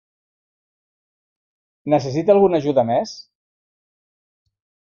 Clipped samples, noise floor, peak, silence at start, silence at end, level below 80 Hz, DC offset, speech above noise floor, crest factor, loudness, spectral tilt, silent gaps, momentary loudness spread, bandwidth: under 0.1%; under -90 dBFS; -2 dBFS; 1.85 s; 1.75 s; -60 dBFS; under 0.1%; over 73 dB; 20 dB; -18 LUFS; -7 dB/octave; none; 17 LU; 7.2 kHz